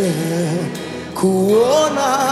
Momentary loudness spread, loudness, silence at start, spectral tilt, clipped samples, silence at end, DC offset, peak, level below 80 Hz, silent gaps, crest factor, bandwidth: 12 LU; -17 LUFS; 0 s; -5 dB/octave; under 0.1%; 0 s; under 0.1%; -4 dBFS; -54 dBFS; none; 12 dB; 15.5 kHz